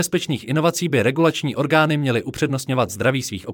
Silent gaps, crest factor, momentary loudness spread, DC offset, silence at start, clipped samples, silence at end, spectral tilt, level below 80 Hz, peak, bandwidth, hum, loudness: none; 16 dB; 6 LU; under 0.1%; 0 s; under 0.1%; 0 s; -5 dB/octave; -58 dBFS; -4 dBFS; 18.5 kHz; none; -20 LUFS